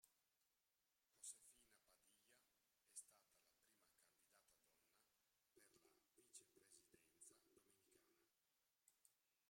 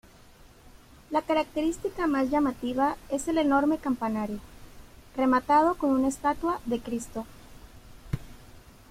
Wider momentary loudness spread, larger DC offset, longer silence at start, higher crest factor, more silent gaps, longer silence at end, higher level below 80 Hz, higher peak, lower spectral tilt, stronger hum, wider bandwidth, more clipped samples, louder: second, 9 LU vs 15 LU; neither; second, 0 s vs 0.65 s; first, 30 dB vs 16 dB; neither; second, 0 s vs 0.3 s; second, under -90 dBFS vs -50 dBFS; second, -44 dBFS vs -12 dBFS; second, 0 dB/octave vs -5.5 dB/octave; neither; about the same, 16 kHz vs 16 kHz; neither; second, -63 LUFS vs -27 LUFS